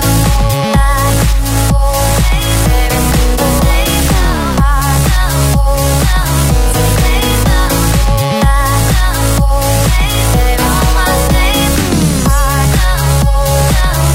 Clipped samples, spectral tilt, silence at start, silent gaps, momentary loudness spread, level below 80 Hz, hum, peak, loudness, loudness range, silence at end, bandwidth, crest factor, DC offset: under 0.1%; -4.5 dB/octave; 0 s; none; 1 LU; -12 dBFS; none; 0 dBFS; -11 LUFS; 0 LU; 0 s; 16.5 kHz; 10 dB; under 0.1%